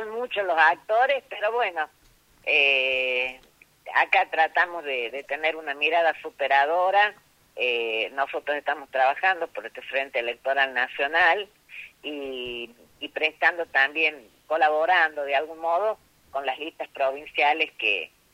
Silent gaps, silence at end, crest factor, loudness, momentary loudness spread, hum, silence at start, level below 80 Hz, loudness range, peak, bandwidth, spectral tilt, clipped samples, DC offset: none; 0.3 s; 20 dB; -24 LUFS; 14 LU; none; 0 s; -68 dBFS; 3 LU; -4 dBFS; 16 kHz; -2 dB/octave; under 0.1%; under 0.1%